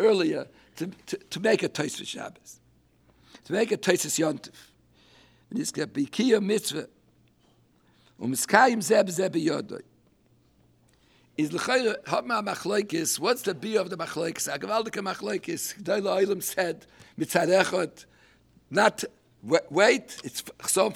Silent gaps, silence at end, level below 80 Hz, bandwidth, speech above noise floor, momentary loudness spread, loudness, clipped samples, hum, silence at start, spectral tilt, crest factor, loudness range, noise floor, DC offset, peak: none; 0 s; -70 dBFS; 17.5 kHz; 37 dB; 15 LU; -26 LUFS; under 0.1%; none; 0 s; -3.5 dB/octave; 24 dB; 4 LU; -63 dBFS; under 0.1%; -4 dBFS